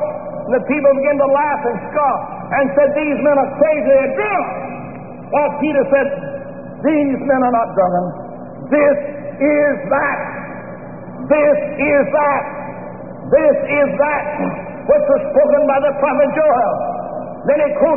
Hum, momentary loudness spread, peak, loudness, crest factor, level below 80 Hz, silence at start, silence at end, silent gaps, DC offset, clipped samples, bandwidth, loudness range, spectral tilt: none; 15 LU; -2 dBFS; -16 LUFS; 14 dB; -50 dBFS; 0 s; 0 s; none; 0.7%; under 0.1%; 3.3 kHz; 3 LU; -1.5 dB/octave